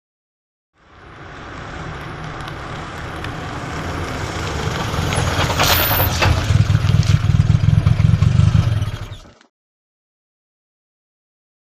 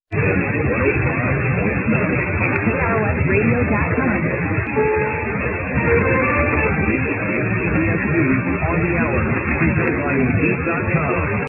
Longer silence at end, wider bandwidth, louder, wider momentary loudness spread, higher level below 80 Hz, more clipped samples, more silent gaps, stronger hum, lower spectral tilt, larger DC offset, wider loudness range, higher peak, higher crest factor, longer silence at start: first, 2.45 s vs 0 s; first, 15 kHz vs 3 kHz; about the same, -17 LUFS vs -18 LUFS; first, 17 LU vs 3 LU; about the same, -30 dBFS vs -32 dBFS; neither; neither; neither; second, -5.5 dB/octave vs -13 dB/octave; neither; first, 14 LU vs 1 LU; first, 0 dBFS vs -4 dBFS; about the same, 18 dB vs 16 dB; first, 1 s vs 0.1 s